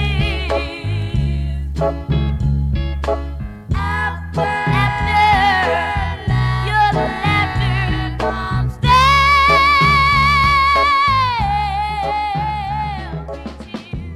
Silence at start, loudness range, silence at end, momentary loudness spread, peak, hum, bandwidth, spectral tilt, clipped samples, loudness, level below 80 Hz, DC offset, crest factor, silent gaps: 0 s; 8 LU; 0 s; 13 LU; 0 dBFS; none; 15 kHz; -5.5 dB/octave; under 0.1%; -16 LUFS; -26 dBFS; under 0.1%; 16 dB; none